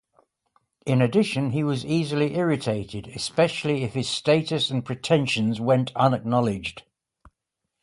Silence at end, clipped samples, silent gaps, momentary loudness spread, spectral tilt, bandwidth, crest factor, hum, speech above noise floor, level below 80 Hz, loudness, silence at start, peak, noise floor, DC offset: 1 s; under 0.1%; none; 7 LU; -6 dB/octave; 11.5 kHz; 20 dB; none; 59 dB; -58 dBFS; -24 LUFS; 0.85 s; -6 dBFS; -82 dBFS; under 0.1%